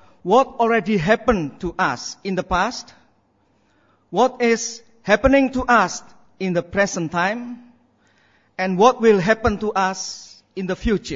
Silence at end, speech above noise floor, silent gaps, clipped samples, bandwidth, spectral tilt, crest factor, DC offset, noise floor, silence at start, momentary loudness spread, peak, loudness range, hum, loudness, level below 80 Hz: 0 s; 43 dB; none; under 0.1%; 7.8 kHz; -5 dB/octave; 20 dB; under 0.1%; -62 dBFS; 0.25 s; 14 LU; 0 dBFS; 4 LU; none; -19 LUFS; -40 dBFS